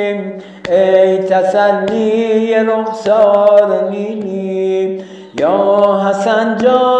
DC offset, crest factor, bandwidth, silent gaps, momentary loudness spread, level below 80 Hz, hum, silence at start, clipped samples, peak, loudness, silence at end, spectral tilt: under 0.1%; 12 dB; 8.6 kHz; none; 11 LU; -58 dBFS; none; 0 s; under 0.1%; 0 dBFS; -12 LUFS; 0 s; -6 dB/octave